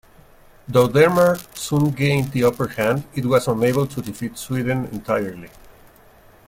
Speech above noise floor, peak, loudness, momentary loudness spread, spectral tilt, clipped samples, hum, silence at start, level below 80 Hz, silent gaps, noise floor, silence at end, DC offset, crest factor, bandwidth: 30 dB; -2 dBFS; -20 LUFS; 11 LU; -6 dB/octave; under 0.1%; none; 0.7 s; -50 dBFS; none; -49 dBFS; 1 s; under 0.1%; 18 dB; 16.5 kHz